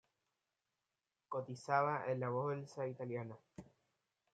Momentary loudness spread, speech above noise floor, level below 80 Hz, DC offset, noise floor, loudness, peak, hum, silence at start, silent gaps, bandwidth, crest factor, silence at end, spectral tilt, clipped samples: 18 LU; over 50 dB; -84 dBFS; under 0.1%; under -90 dBFS; -41 LUFS; -20 dBFS; none; 1.3 s; none; 9.2 kHz; 22 dB; 0.7 s; -7 dB/octave; under 0.1%